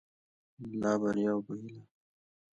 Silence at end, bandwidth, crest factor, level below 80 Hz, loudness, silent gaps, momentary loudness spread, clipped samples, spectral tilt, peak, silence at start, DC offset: 0.7 s; 8.4 kHz; 18 dB; -70 dBFS; -33 LUFS; none; 17 LU; under 0.1%; -7 dB/octave; -18 dBFS; 0.6 s; under 0.1%